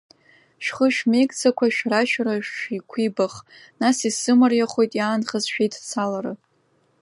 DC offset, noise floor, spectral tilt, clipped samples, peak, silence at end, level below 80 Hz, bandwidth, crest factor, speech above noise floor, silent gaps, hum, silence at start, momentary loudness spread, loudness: under 0.1%; -64 dBFS; -4 dB/octave; under 0.1%; -4 dBFS; 0.65 s; -72 dBFS; 11.5 kHz; 18 dB; 43 dB; none; none; 0.6 s; 11 LU; -21 LUFS